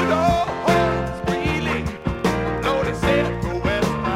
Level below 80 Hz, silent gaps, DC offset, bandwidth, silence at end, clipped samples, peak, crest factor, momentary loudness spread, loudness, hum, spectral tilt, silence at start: -34 dBFS; none; under 0.1%; 16.5 kHz; 0 s; under 0.1%; -4 dBFS; 16 dB; 5 LU; -21 LUFS; none; -6 dB/octave; 0 s